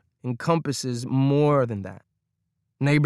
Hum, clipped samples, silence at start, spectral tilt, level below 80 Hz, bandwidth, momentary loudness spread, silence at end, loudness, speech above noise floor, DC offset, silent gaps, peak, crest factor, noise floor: none; under 0.1%; 0.25 s; -6.5 dB/octave; -62 dBFS; 12 kHz; 13 LU; 0 s; -24 LUFS; 54 dB; under 0.1%; none; -8 dBFS; 16 dB; -77 dBFS